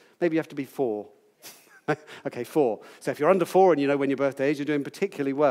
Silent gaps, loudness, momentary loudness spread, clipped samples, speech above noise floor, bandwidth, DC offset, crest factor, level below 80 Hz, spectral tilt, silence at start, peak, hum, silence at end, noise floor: none; -25 LUFS; 14 LU; under 0.1%; 25 dB; 16 kHz; under 0.1%; 18 dB; -84 dBFS; -6.5 dB/octave; 0.2 s; -8 dBFS; none; 0 s; -50 dBFS